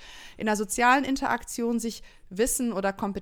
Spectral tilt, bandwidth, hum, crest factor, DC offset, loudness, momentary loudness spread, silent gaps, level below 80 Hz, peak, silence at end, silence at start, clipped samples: -3.5 dB/octave; 19.5 kHz; none; 20 dB; under 0.1%; -26 LUFS; 15 LU; none; -48 dBFS; -8 dBFS; 0 s; 0 s; under 0.1%